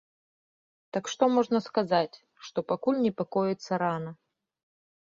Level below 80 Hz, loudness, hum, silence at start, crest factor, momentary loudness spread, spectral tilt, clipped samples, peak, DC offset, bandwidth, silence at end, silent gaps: -72 dBFS; -28 LUFS; none; 0.95 s; 20 dB; 11 LU; -5.5 dB/octave; under 0.1%; -10 dBFS; under 0.1%; 7.6 kHz; 0.9 s; none